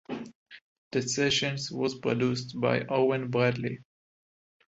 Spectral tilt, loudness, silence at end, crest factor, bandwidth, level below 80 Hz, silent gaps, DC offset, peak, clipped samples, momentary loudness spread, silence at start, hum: -4.5 dB/octave; -28 LUFS; 0.85 s; 20 dB; 8 kHz; -64 dBFS; 0.35-0.46 s, 0.61-0.91 s; under 0.1%; -10 dBFS; under 0.1%; 13 LU; 0.1 s; none